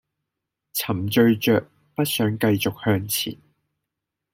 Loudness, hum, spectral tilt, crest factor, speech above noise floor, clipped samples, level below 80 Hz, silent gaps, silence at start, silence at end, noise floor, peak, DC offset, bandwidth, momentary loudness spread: -22 LUFS; none; -5 dB/octave; 18 dB; 62 dB; under 0.1%; -60 dBFS; none; 0.75 s; 1 s; -83 dBFS; -6 dBFS; under 0.1%; 16.5 kHz; 10 LU